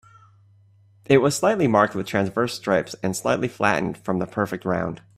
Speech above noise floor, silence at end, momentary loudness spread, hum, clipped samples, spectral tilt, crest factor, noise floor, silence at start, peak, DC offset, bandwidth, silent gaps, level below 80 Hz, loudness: 33 dB; 0.2 s; 7 LU; none; under 0.1%; -5.5 dB/octave; 20 dB; -55 dBFS; 1.1 s; -2 dBFS; under 0.1%; 15 kHz; none; -58 dBFS; -22 LUFS